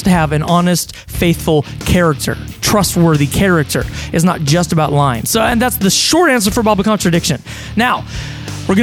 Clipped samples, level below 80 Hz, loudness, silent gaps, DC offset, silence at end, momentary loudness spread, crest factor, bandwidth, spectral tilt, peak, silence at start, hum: under 0.1%; -30 dBFS; -13 LUFS; none; under 0.1%; 0 s; 8 LU; 14 dB; 17 kHz; -4.5 dB/octave; 0 dBFS; 0 s; none